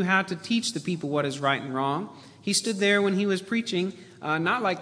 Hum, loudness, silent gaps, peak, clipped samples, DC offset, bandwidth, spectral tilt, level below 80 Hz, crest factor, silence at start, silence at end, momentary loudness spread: none; -26 LUFS; none; -6 dBFS; under 0.1%; under 0.1%; 11 kHz; -4 dB/octave; -74 dBFS; 20 dB; 0 s; 0 s; 9 LU